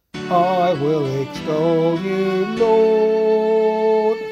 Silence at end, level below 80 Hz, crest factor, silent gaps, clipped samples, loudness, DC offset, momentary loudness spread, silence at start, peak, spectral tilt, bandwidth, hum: 0 s; -56 dBFS; 12 dB; none; under 0.1%; -18 LUFS; under 0.1%; 5 LU; 0.15 s; -4 dBFS; -7 dB/octave; 8 kHz; none